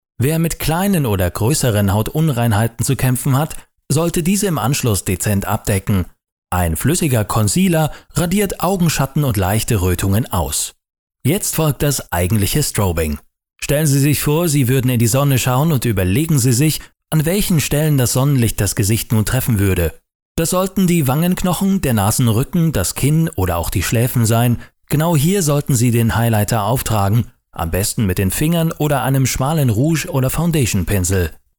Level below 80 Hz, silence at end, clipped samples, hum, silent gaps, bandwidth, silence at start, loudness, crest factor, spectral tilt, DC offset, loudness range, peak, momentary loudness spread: -34 dBFS; 0.2 s; under 0.1%; none; 6.32-6.42 s, 10.99-11.07 s, 20.15-20.35 s; over 20 kHz; 0.2 s; -16 LUFS; 12 dB; -5.5 dB/octave; 0.1%; 2 LU; -4 dBFS; 5 LU